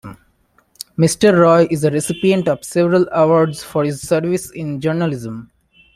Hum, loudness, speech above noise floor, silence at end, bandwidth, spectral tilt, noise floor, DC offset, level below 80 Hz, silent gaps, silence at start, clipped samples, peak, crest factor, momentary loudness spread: none; -16 LUFS; 43 dB; 0.5 s; 15 kHz; -6 dB/octave; -58 dBFS; under 0.1%; -52 dBFS; none; 0.05 s; under 0.1%; -2 dBFS; 14 dB; 14 LU